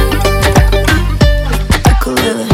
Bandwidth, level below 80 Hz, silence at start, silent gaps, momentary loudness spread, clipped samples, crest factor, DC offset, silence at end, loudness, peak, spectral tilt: 16 kHz; -14 dBFS; 0 s; none; 4 LU; under 0.1%; 10 dB; under 0.1%; 0 s; -11 LUFS; 0 dBFS; -5 dB/octave